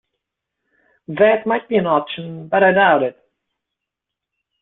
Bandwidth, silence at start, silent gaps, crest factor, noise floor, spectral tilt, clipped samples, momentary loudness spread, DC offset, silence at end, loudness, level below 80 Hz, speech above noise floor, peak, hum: 4.1 kHz; 1.1 s; none; 18 dB; -83 dBFS; -10 dB/octave; under 0.1%; 15 LU; under 0.1%; 1.5 s; -16 LUFS; -62 dBFS; 67 dB; -2 dBFS; none